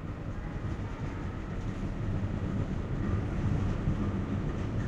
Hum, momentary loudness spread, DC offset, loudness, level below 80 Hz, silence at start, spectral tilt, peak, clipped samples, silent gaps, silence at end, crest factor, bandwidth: none; 6 LU; under 0.1%; -34 LUFS; -40 dBFS; 0 s; -8.5 dB/octave; -18 dBFS; under 0.1%; none; 0 s; 14 dB; 8.2 kHz